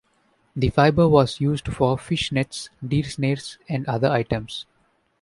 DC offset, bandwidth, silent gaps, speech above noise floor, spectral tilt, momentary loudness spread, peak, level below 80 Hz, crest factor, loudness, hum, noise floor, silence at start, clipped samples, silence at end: under 0.1%; 11.5 kHz; none; 43 dB; -6.5 dB/octave; 13 LU; -2 dBFS; -44 dBFS; 20 dB; -22 LUFS; none; -64 dBFS; 0.55 s; under 0.1%; 0.6 s